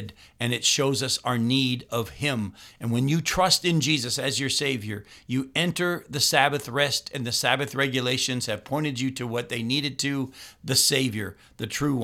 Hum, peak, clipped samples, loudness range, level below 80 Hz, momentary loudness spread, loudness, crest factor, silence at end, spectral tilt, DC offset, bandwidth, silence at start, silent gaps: none; -4 dBFS; under 0.1%; 2 LU; -56 dBFS; 11 LU; -24 LUFS; 22 dB; 0 s; -3.5 dB/octave; under 0.1%; 17 kHz; 0 s; none